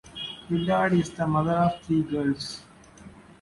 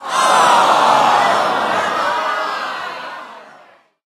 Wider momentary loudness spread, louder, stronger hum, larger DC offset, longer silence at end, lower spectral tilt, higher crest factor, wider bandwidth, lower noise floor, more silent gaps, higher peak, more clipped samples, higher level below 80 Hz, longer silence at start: about the same, 13 LU vs 15 LU; second, -26 LUFS vs -14 LUFS; neither; neither; second, 0.2 s vs 0.6 s; first, -6.5 dB/octave vs -2 dB/octave; about the same, 14 dB vs 16 dB; second, 11.5 kHz vs 15 kHz; about the same, -48 dBFS vs -47 dBFS; neither; second, -12 dBFS vs 0 dBFS; neither; first, -54 dBFS vs -68 dBFS; about the same, 0.05 s vs 0 s